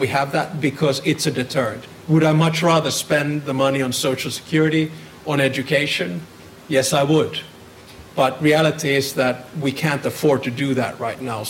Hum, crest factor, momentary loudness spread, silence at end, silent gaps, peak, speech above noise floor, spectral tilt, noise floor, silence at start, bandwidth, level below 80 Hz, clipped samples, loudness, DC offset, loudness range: none; 14 dB; 9 LU; 0 s; none; -6 dBFS; 23 dB; -5 dB/octave; -42 dBFS; 0 s; 16.5 kHz; -56 dBFS; under 0.1%; -19 LUFS; under 0.1%; 2 LU